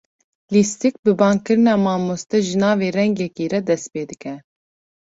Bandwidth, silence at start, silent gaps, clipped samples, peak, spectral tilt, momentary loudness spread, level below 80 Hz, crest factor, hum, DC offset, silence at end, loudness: 8 kHz; 0.5 s; 0.99-1.03 s; under 0.1%; -2 dBFS; -5.5 dB/octave; 13 LU; -60 dBFS; 18 dB; none; under 0.1%; 0.75 s; -19 LUFS